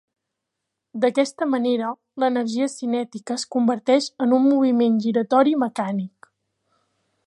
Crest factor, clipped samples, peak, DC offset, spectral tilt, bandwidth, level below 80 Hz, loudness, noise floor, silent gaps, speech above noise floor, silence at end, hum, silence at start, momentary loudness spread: 18 dB; under 0.1%; -4 dBFS; under 0.1%; -5.5 dB/octave; 11.5 kHz; -78 dBFS; -21 LUFS; -81 dBFS; none; 61 dB; 1.2 s; none; 0.95 s; 10 LU